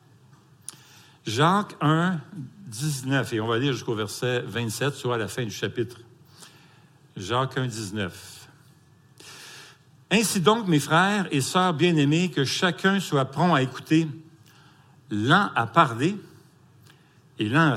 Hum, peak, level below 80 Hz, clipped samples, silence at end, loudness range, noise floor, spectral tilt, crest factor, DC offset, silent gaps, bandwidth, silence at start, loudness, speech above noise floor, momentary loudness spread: none; -4 dBFS; -68 dBFS; under 0.1%; 0 s; 10 LU; -56 dBFS; -5 dB/octave; 22 dB; under 0.1%; none; 16.5 kHz; 1.25 s; -24 LUFS; 32 dB; 21 LU